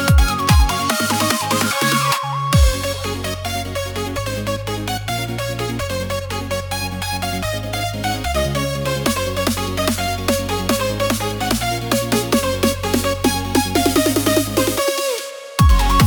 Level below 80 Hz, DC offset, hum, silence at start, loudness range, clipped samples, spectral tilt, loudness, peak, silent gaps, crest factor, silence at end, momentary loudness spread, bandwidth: -26 dBFS; under 0.1%; none; 0 s; 6 LU; under 0.1%; -4.5 dB/octave; -19 LUFS; 0 dBFS; none; 18 dB; 0 s; 8 LU; 19 kHz